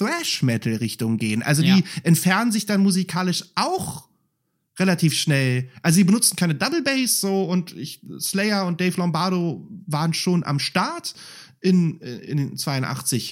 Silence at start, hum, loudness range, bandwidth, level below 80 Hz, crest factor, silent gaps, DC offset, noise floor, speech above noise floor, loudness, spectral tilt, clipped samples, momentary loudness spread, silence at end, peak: 0 s; none; 4 LU; 16.5 kHz; -66 dBFS; 18 dB; none; under 0.1%; -73 dBFS; 52 dB; -21 LUFS; -4.5 dB/octave; under 0.1%; 10 LU; 0 s; -4 dBFS